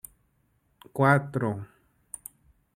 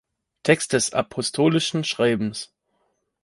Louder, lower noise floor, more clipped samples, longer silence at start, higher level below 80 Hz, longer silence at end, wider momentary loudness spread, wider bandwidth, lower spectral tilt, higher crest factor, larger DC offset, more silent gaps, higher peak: second, -26 LUFS vs -22 LUFS; about the same, -70 dBFS vs -71 dBFS; neither; first, 0.95 s vs 0.45 s; second, -66 dBFS vs -60 dBFS; first, 1.1 s vs 0.8 s; first, 25 LU vs 9 LU; first, 16 kHz vs 11.5 kHz; first, -7 dB/octave vs -4 dB/octave; about the same, 24 dB vs 22 dB; neither; neither; second, -6 dBFS vs -2 dBFS